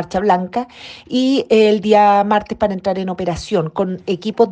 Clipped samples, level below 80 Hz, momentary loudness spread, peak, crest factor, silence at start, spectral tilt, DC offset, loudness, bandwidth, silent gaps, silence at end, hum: under 0.1%; -46 dBFS; 10 LU; 0 dBFS; 16 dB; 0 s; -6 dB/octave; under 0.1%; -16 LUFS; 9.2 kHz; none; 0 s; none